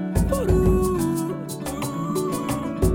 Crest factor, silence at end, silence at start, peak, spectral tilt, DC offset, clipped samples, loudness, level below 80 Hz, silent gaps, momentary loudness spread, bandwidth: 16 dB; 0 s; 0 s; -8 dBFS; -6.5 dB/octave; under 0.1%; under 0.1%; -23 LUFS; -30 dBFS; none; 9 LU; 17.5 kHz